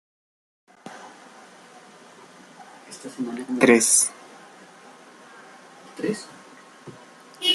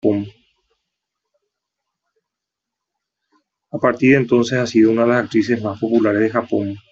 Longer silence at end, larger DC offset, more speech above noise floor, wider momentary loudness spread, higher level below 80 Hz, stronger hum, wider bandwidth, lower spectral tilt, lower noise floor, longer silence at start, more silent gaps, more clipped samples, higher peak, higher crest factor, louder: second, 0 s vs 0.15 s; neither; second, 27 dB vs 67 dB; first, 30 LU vs 9 LU; second, -72 dBFS vs -60 dBFS; neither; first, 13 kHz vs 7.6 kHz; second, -1.5 dB/octave vs -6.5 dB/octave; second, -48 dBFS vs -83 dBFS; first, 0.85 s vs 0.05 s; neither; neither; about the same, -2 dBFS vs -2 dBFS; first, 26 dB vs 16 dB; second, -21 LUFS vs -17 LUFS